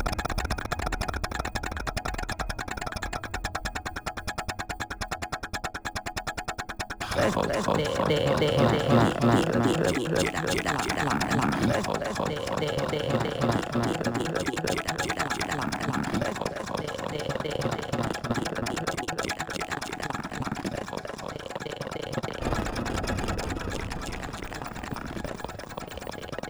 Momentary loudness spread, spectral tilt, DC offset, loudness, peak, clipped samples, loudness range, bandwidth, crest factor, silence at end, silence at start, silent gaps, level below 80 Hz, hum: 11 LU; -5 dB/octave; under 0.1%; -29 LUFS; -10 dBFS; under 0.1%; 9 LU; over 20 kHz; 20 dB; 0 s; 0 s; none; -42 dBFS; none